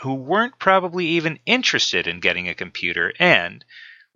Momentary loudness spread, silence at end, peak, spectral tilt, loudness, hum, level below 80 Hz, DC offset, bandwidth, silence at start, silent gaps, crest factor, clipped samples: 9 LU; 0.2 s; 0 dBFS; -3.5 dB/octave; -19 LUFS; none; -62 dBFS; under 0.1%; 7.6 kHz; 0 s; none; 20 dB; under 0.1%